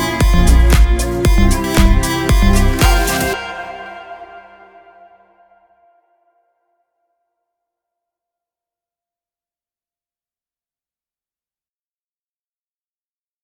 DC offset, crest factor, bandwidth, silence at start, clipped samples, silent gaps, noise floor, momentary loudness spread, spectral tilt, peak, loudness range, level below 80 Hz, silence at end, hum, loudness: under 0.1%; 16 dB; over 20 kHz; 0 s; under 0.1%; none; under -90 dBFS; 19 LU; -5 dB/octave; 0 dBFS; 20 LU; -18 dBFS; 9.05 s; none; -14 LUFS